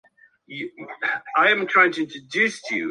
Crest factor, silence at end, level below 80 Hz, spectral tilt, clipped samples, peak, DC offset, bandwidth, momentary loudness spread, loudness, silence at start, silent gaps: 20 dB; 0 s; -76 dBFS; -3.5 dB/octave; under 0.1%; -4 dBFS; under 0.1%; 11 kHz; 17 LU; -20 LUFS; 0.5 s; none